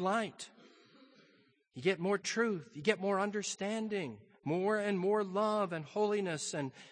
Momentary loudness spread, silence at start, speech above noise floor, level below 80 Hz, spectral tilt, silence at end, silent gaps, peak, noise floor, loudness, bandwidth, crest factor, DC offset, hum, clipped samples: 9 LU; 0 s; 35 dB; -82 dBFS; -4.5 dB/octave; 0 s; none; -14 dBFS; -69 dBFS; -35 LUFS; 9.8 kHz; 20 dB; under 0.1%; none; under 0.1%